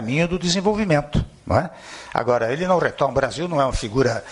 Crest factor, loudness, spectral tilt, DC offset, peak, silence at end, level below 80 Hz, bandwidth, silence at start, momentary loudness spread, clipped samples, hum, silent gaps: 18 dB; -21 LUFS; -5.5 dB/octave; under 0.1%; -2 dBFS; 0 s; -36 dBFS; 11 kHz; 0 s; 6 LU; under 0.1%; none; none